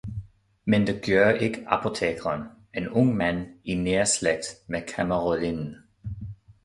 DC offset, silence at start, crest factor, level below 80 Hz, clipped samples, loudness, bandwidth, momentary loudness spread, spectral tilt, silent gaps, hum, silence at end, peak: under 0.1%; 0.05 s; 22 dB; -50 dBFS; under 0.1%; -25 LUFS; 11.5 kHz; 16 LU; -5 dB/octave; none; none; 0.3 s; -4 dBFS